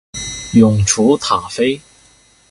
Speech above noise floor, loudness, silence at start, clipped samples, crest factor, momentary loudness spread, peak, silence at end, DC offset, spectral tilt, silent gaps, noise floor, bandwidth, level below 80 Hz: 37 dB; -14 LUFS; 0.15 s; under 0.1%; 16 dB; 13 LU; 0 dBFS; 0.7 s; under 0.1%; -5 dB/octave; none; -50 dBFS; 11.5 kHz; -38 dBFS